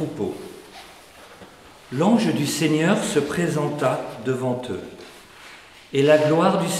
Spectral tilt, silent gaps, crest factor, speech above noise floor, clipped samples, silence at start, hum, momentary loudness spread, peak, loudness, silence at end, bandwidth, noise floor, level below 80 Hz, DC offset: -5.5 dB/octave; none; 18 dB; 25 dB; under 0.1%; 0 s; none; 25 LU; -4 dBFS; -21 LUFS; 0 s; 16 kHz; -45 dBFS; -60 dBFS; under 0.1%